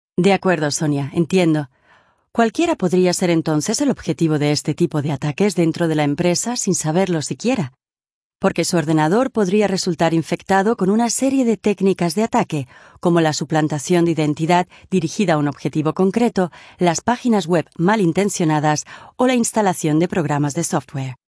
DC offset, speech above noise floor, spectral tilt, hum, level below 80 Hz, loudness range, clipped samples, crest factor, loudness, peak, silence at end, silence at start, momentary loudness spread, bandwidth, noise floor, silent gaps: under 0.1%; 38 dB; -5.5 dB/octave; none; -56 dBFS; 2 LU; under 0.1%; 16 dB; -18 LUFS; -2 dBFS; 0.15 s; 0.2 s; 5 LU; 11 kHz; -55 dBFS; 8.10-8.30 s